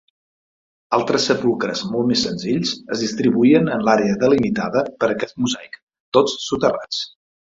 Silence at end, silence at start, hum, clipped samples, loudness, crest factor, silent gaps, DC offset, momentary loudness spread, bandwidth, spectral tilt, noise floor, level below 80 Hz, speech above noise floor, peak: 0.5 s; 0.9 s; none; under 0.1%; -19 LUFS; 18 dB; 5.82-5.87 s, 6.00-6.12 s; under 0.1%; 8 LU; 7.8 kHz; -5 dB/octave; under -90 dBFS; -54 dBFS; over 72 dB; -2 dBFS